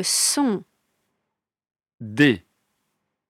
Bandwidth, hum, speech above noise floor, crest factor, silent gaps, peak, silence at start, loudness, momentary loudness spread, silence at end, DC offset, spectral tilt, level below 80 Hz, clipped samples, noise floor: 16 kHz; none; 61 dB; 20 dB; none; -6 dBFS; 0 s; -20 LUFS; 15 LU; 0.9 s; under 0.1%; -3 dB/octave; -66 dBFS; under 0.1%; -82 dBFS